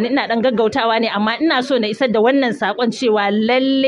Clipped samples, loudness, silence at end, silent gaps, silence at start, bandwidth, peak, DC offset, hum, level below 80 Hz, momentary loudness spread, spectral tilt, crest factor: under 0.1%; -16 LUFS; 0 s; none; 0 s; 11 kHz; -4 dBFS; under 0.1%; none; -62 dBFS; 4 LU; -5 dB/octave; 12 dB